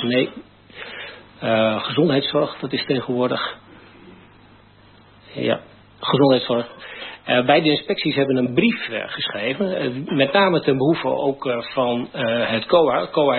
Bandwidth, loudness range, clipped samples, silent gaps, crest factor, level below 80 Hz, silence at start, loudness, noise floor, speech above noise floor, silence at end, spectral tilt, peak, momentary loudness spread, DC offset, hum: 4.5 kHz; 6 LU; under 0.1%; none; 18 dB; -60 dBFS; 0 s; -20 LUFS; -49 dBFS; 30 dB; 0 s; -10.5 dB/octave; -2 dBFS; 15 LU; under 0.1%; none